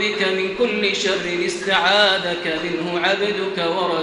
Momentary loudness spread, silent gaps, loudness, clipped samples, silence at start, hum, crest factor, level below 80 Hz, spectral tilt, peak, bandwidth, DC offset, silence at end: 7 LU; none; -19 LUFS; under 0.1%; 0 s; none; 18 dB; -56 dBFS; -3.5 dB/octave; -2 dBFS; 11 kHz; under 0.1%; 0 s